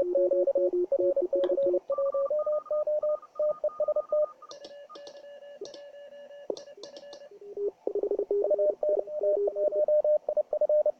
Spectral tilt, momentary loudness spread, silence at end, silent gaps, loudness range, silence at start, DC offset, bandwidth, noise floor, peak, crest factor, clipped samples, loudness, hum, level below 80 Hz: -5.5 dB/octave; 21 LU; 0.1 s; none; 12 LU; 0 s; under 0.1%; 6.6 kHz; -47 dBFS; -14 dBFS; 14 dB; under 0.1%; -28 LUFS; none; -72 dBFS